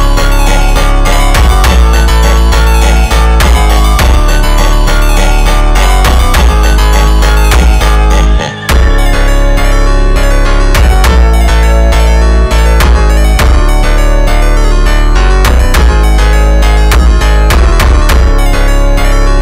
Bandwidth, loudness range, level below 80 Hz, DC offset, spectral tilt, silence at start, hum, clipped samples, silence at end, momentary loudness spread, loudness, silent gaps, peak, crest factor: 16.5 kHz; 1 LU; -6 dBFS; under 0.1%; -5 dB/octave; 0 s; none; under 0.1%; 0 s; 3 LU; -8 LUFS; none; 0 dBFS; 4 dB